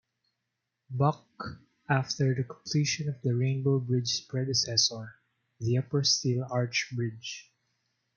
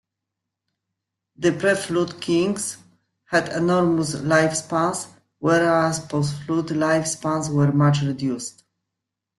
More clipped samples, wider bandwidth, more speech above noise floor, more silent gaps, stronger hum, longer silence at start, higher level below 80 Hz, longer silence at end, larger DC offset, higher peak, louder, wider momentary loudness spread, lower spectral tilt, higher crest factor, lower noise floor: neither; second, 7.2 kHz vs 12.5 kHz; second, 54 dB vs 63 dB; neither; neither; second, 0.9 s vs 1.4 s; second, -68 dBFS vs -60 dBFS; second, 0.75 s vs 0.9 s; neither; second, -10 dBFS vs -2 dBFS; second, -29 LUFS vs -21 LUFS; first, 16 LU vs 8 LU; about the same, -4.5 dB/octave vs -5.5 dB/octave; about the same, 20 dB vs 20 dB; about the same, -84 dBFS vs -83 dBFS